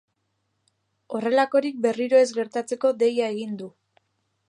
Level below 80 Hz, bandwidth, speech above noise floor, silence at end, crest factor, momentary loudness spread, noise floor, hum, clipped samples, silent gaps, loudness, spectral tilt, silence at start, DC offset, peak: -80 dBFS; 11 kHz; 52 dB; 0.8 s; 18 dB; 14 LU; -74 dBFS; none; under 0.1%; none; -23 LUFS; -4.5 dB/octave; 1.1 s; under 0.1%; -8 dBFS